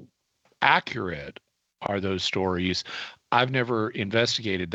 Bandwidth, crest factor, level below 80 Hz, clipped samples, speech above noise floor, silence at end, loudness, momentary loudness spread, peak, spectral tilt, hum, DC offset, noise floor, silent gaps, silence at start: 8.4 kHz; 24 dB; -58 dBFS; under 0.1%; 43 dB; 0 s; -25 LUFS; 14 LU; -4 dBFS; -4.5 dB/octave; none; under 0.1%; -69 dBFS; none; 0 s